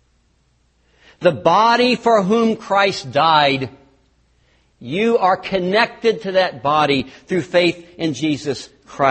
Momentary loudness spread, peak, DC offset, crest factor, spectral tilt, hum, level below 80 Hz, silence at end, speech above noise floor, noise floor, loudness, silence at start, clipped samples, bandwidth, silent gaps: 10 LU; 0 dBFS; under 0.1%; 18 dB; -5 dB/octave; none; -56 dBFS; 0 s; 44 dB; -60 dBFS; -17 LUFS; 1.2 s; under 0.1%; 8.8 kHz; none